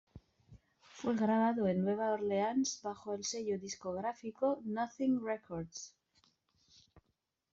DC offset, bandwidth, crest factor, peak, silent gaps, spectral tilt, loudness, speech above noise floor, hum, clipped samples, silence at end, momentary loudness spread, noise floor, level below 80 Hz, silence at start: under 0.1%; 7.8 kHz; 16 dB; -22 dBFS; none; -5.5 dB/octave; -36 LUFS; 48 dB; none; under 0.1%; 0.55 s; 11 LU; -83 dBFS; -72 dBFS; 0.15 s